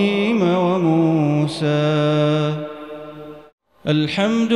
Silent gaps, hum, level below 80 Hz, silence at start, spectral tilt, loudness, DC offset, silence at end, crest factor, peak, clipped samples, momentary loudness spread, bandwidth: 3.53-3.58 s; none; -60 dBFS; 0 s; -7 dB/octave; -18 LUFS; 0.2%; 0 s; 14 dB; -4 dBFS; under 0.1%; 17 LU; 11 kHz